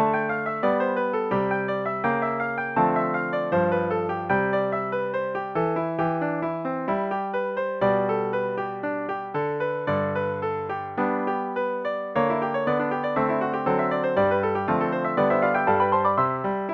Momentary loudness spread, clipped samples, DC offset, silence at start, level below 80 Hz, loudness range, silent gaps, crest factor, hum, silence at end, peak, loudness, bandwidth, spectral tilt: 6 LU; under 0.1%; under 0.1%; 0 s; -60 dBFS; 4 LU; none; 16 dB; none; 0 s; -8 dBFS; -25 LUFS; 6.2 kHz; -9 dB/octave